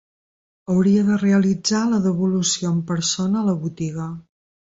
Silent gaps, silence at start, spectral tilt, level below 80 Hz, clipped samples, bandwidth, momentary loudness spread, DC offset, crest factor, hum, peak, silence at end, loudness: none; 0.7 s; -5 dB/octave; -58 dBFS; under 0.1%; 8 kHz; 11 LU; under 0.1%; 14 dB; none; -8 dBFS; 0.45 s; -20 LUFS